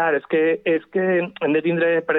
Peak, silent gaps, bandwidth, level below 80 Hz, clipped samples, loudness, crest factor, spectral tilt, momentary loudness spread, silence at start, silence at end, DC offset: -8 dBFS; none; 4.1 kHz; -70 dBFS; under 0.1%; -20 LUFS; 12 dB; -9.5 dB/octave; 2 LU; 0 s; 0 s; under 0.1%